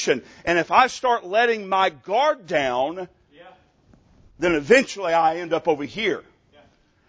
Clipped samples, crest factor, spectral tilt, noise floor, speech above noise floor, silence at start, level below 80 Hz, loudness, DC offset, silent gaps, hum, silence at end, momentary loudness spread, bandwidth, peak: under 0.1%; 20 dB; -4 dB/octave; -57 dBFS; 36 dB; 0 s; -56 dBFS; -21 LUFS; under 0.1%; none; none; 0.9 s; 8 LU; 8 kHz; -2 dBFS